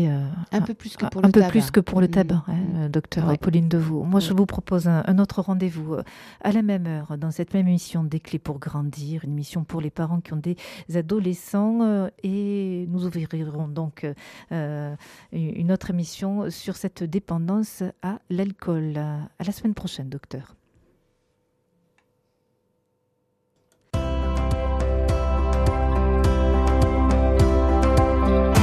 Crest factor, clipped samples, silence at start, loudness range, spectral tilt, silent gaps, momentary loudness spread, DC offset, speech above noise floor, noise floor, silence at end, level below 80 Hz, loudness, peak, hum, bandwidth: 20 dB; under 0.1%; 0 s; 10 LU; -7.5 dB/octave; none; 11 LU; under 0.1%; 47 dB; -71 dBFS; 0 s; -30 dBFS; -24 LUFS; -4 dBFS; none; 14.5 kHz